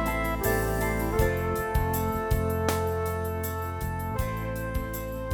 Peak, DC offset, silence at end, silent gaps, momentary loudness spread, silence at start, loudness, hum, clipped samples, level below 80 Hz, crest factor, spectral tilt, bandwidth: -10 dBFS; under 0.1%; 0 s; none; 6 LU; 0 s; -29 LUFS; none; under 0.1%; -34 dBFS; 18 dB; -6 dB/octave; over 20 kHz